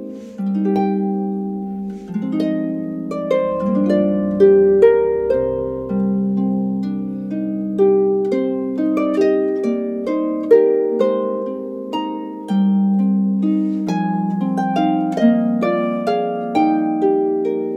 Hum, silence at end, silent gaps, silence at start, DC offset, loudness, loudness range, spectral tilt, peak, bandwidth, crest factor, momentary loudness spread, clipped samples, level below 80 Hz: none; 0 s; none; 0 s; under 0.1%; -18 LUFS; 4 LU; -9 dB/octave; 0 dBFS; 7.6 kHz; 16 dB; 11 LU; under 0.1%; -52 dBFS